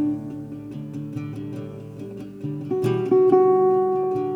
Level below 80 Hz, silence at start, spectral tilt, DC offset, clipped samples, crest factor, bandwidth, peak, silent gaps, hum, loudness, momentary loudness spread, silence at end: -62 dBFS; 0 s; -9.5 dB/octave; under 0.1%; under 0.1%; 16 dB; 5.6 kHz; -6 dBFS; none; none; -21 LUFS; 19 LU; 0 s